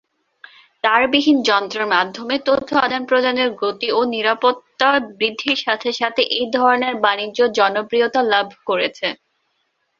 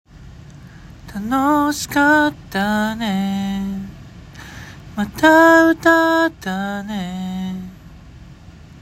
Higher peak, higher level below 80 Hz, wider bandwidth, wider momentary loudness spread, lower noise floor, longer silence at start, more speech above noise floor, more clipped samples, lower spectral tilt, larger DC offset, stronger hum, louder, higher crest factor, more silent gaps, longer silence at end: about the same, 0 dBFS vs 0 dBFS; second, -62 dBFS vs -44 dBFS; second, 7.6 kHz vs 16.5 kHz; second, 6 LU vs 22 LU; first, -69 dBFS vs -41 dBFS; first, 0.85 s vs 0.15 s; first, 51 dB vs 25 dB; neither; second, -3.5 dB/octave vs -5 dB/octave; neither; neither; about the same, -18 LUFS vs -17 LUFS; about the same, 18 dB vs 18 dB; neither; first, 0.85 s vs 0 s